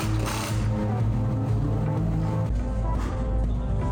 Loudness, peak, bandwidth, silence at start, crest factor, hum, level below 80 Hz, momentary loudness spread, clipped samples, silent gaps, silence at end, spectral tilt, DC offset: -27 LUFS; -16 dBFS; 17 kHz; 0 s; 10 dB; none; -30 dBFS; 3 LU; under 0.1%; none; 0 s; -7 dB/octave; under 0.1%